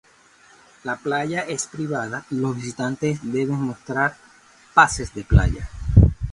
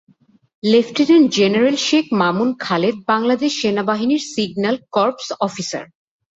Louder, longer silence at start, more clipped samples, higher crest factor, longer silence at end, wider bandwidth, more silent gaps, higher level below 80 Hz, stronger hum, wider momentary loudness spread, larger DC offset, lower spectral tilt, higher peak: second, -22 LUFS vs -17 LUFS; first, 0.85 s vs 0.65 s; neither; first, 22 dB vs 14 dB; second, 0 s vs 0.55 s; first, 11.5 kHz vs 8 kHz; neither; first, -30 dBFS vs -62 dBFS; neither; about the same, 11 LU vs 9 LU; neither; first, -6 dB/octave vs -4.5 dB/octave; about the same, 0 dBFS vs -2 dBFS